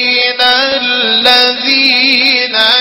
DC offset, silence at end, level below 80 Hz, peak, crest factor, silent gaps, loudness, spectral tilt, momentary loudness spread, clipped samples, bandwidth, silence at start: under 0.1%; 0 s; -52 dBFS; 0 dBFS; 10 dB; none; -7 LUFS; -1.5 dB/octave; 3 LU; 0.6%; over 20 kHz; 0 s